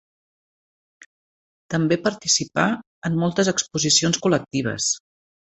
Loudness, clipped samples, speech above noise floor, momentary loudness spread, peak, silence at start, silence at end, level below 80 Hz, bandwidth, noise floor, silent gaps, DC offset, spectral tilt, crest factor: -21 LUFS; under 0.1%; over 69 dB; 9 LU; -2 dBFS; 1.7 s; 0.6 s; -58 dBFS; 8.4 kHz; under -90 dBFS; 2.87-3.02 s; under 0.1%; -3.5 dB/octave; 22 dB